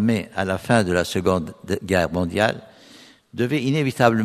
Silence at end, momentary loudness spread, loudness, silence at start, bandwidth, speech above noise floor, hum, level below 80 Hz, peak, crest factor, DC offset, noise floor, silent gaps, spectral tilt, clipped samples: 0 s; 9 LU; -22 LUFS; 0 s; 13.5 kHz; 28 dB; none; -50 dBFS; 0 dBFS; 22 dB; under 0.1%; -48 dBFS; none; -6 dB/octave; under 0.1%